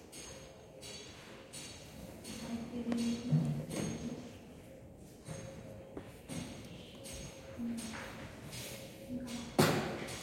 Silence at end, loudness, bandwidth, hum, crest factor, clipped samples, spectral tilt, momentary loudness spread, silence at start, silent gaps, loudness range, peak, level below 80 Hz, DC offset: 0 s; -40 LUFS; 16.5 kHz; none; 28 dB; under 0.1%; -5 dB/octave; 17 LU; 0 s; none; 9 LU; -12 dBFS; -62 dBFS; under 0.1%